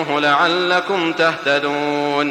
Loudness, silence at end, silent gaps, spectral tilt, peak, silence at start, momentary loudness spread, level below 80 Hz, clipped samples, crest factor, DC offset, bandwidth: -17 LUFS; 0 s; none; -4.5 dB/octave; -2 dBFS; 0 s; 5 LU; -64 dBFS; under 0.1%; 14 dB; under 0.1%; 15.5 kHz